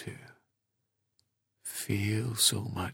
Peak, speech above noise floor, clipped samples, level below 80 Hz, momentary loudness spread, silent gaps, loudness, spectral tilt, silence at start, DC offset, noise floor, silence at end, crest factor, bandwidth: -12 dBFS; 52 dB; under 0.1%; -64 dBFS; 19 LU; none; -29 LUFS; -3 dB/octave; 0 s; under 0.1%; -82 dBFS; 0 s; 24 dB; 18 kHz